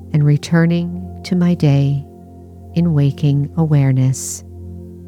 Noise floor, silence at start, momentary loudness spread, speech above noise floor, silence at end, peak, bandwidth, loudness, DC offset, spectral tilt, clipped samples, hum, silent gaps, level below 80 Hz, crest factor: -37 dBFS; 0 s; 14 LU; 23 dB; 0 s; -4 dBFS; 13.5 kHz; -16 LUFS; under 0.1%; -7 dB/octave; under 0.1%; none; none; -46 dBFS; 12 dB